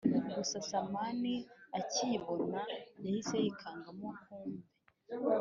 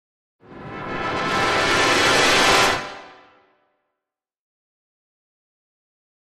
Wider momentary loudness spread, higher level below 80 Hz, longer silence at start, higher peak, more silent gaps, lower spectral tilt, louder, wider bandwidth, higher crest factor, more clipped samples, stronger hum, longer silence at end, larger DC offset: second, 12 LU vs 18 LU; second, -76 dBFS vs -46 dBFS; second, 0 s vs 0.5 s; second, -18 dBFS vs -4 dBFS; neither; first, -4.5 dB/octave vs -2 dB/octave; second, -38 LUFS vs -17 LUFS; second, 7.4 kHz vs 15.5 kHz; about the same, 20 dB vs 20 dB; neither; neither; second, 0 s vs 3.1 s; neither